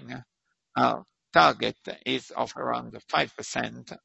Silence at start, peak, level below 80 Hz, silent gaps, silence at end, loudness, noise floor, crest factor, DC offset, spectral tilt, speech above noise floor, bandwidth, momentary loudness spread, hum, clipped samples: 0 s; -4 dBFS; -64 dBFS; none; 0.1 s; -27 LUFS; -79 dBFS; 24 dB; under 0.1%; -4 dB/octave; 52 dB; 8.2 kHz; 15 LU; none; under 0.1%